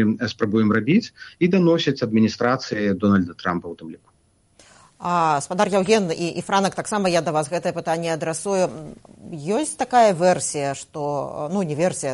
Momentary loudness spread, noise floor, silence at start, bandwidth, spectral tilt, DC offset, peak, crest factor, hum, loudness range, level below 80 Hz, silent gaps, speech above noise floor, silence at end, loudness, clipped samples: 10 LU; -58 dBFS; 0 s; 11.5 kHz; -5 dB/octave; under 0.1%; -4 dBFS; 18 dB; none; 3 LU; -60 dBFS; none; 37 dB; 0 s; -21 LUFS; under 0.1%